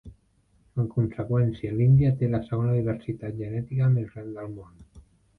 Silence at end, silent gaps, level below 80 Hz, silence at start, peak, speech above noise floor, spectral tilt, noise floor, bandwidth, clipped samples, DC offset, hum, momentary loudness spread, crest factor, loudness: 0.4 s; none; -50 dBFS; 0.05 s; -10 dBFS; 40 dB; -11 dB/octave; -64 dBFS; 4.2 kHz; under 0.1%; under 0.1%; none; 16 LU; 14 dB; -26 LUFS